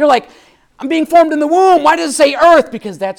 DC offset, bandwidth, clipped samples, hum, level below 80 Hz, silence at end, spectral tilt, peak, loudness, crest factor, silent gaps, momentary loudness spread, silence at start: under 0.1%; 17 kHz; under 0.1%; none; -50 dBFS; 0.05 s; -3 dB/octave; 0 dBFS; -11 LUFS; 10 dB; none; 11 LU; 0 s